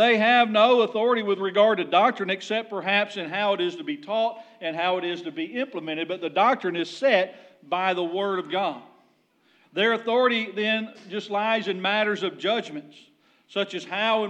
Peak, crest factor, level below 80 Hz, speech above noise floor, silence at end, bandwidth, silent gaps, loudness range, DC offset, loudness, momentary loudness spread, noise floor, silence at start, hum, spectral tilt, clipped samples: -6 dBFS; 18 dB; under -90 dBFS; 40 dB; 0 s; 9 kHz; none; 5 LU; under 0.1%; -24 LUFS; 11 LU; -64 dBFS; 0 s; none; -5 dB/octave; under 0.1%